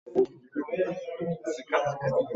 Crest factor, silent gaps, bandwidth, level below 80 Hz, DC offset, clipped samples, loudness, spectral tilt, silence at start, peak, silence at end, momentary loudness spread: 18 dB; none; 8 kHz; -66 dBFS; under 0.1%; under 0.1%; -30 LUFS; -6.5 dB/octave; 0.05 s; -12 dBFS; 0 s; 6 LU